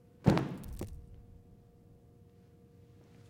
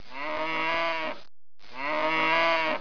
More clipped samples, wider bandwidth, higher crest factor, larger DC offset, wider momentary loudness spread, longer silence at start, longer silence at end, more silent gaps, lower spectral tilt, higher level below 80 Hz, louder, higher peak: neither; first, 16.5 kHz vs 5.4 kHz; first, 28 dB vs 16 dB; second, under 0.1% vs 2%; first, 28 LU vs 13 LU; first, 0.2 s vs 0.05 s; first, 1.75 s vs 0 s; neither; first, -7.5 dB/octave vs -3.5 dB/octave; first, -52 dBFS vs -62 dBFS; second, -34 LUFS vs -27 LUFS; first, -10 dBFS vs -14 dBFS